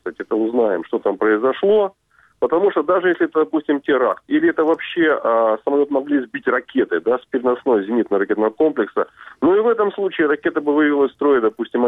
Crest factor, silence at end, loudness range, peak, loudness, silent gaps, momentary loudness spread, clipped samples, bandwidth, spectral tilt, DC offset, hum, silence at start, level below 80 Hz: 12 dB; 0 s; 1 LU; -6 dBFS; -18 LUFS; none; 5 LU; under 0.1%; 3.9 kHz; -8 dB/octave; under 0.1%; none; 0.05 s; -62 dBFS